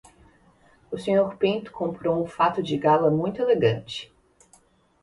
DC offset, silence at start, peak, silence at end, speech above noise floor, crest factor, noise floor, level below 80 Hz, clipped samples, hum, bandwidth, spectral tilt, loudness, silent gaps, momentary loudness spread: under 0.1%; 0.9 s; -8 dBFS; 0.95 s; 36 dB; 16 dB; -59 dBFS; -60 dBFS; under 0.1%; none; 11.5 kHz; -7 dB/octave; -24 LUFS; none; 12 LU